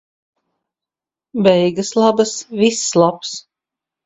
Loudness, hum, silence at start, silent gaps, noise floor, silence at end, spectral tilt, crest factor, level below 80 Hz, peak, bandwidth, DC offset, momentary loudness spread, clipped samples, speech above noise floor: -15 LUFS; none; 1.35 s; none; -88 dBFS; 0.65 s; -4.5 dB/octave; 18 dB; -60 dBFS; 0 dBFS; 8.4 kHz; under 0.1%; 14 LU; under 0.1%; 73 dB